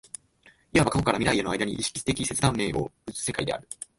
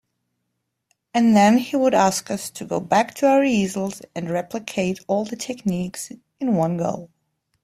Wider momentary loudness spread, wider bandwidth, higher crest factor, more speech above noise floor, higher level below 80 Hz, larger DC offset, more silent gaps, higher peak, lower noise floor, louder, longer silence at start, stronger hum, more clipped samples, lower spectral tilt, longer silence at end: about the same, 10 LU vs 12 LU; second, 12 kHz vs 15 kHz; about the same, 20 dB vs 18 dB; second, 33 dB vs 56 dB; first, -48 dBFS vs -60 dBFS; neither; neither; second, -6 dBFS vs -2 dBFS; second, -59 dBFS vs -77 dBFS; second, -26 LUFS vs -21 LUFS; second, 0.75 s vs 1.15 s; neither; neither; second, -4 dB/octave vs -5.5 dB/octave; second, 0.15 s vs 0.55 s